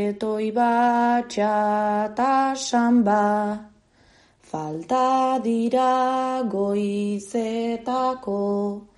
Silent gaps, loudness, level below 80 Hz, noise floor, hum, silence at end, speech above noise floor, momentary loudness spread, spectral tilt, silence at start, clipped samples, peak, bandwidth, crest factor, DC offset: none; -22 LUFS; -64 dBFS; -57 dBFS; none; 0.15 s; 35 dB; 7 LU; -5.5 dB/octave; 0 s; under 0.1%; -10 dBFS; 11.5 kHz; 14 dB; under 0.1%